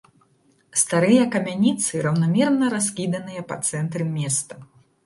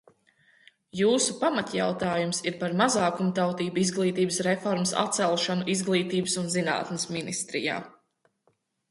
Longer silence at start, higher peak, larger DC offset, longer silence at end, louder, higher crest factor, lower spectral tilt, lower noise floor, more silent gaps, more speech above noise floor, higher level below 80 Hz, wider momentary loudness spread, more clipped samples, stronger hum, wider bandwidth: second, 0.75 s vs 0.95 s; first, -4 dBFS vs -8 dBFS; neither; second, 0.4 s vs 1 s; first, -21 LUFS vs -26 LUFS; about the same, 18 dB vs 20 dB; about the same, -5 dB/octave vs -4 dB/octave; second, -61 dBFS vs -71 dBFS; neither; second, 40 dB vs 45 dB; about the same, -64 dBFS vs -68 dBFS; first, 10 LU vs 6 LU; neither; neither; about the same, 12 kHz vs 11.5 kHz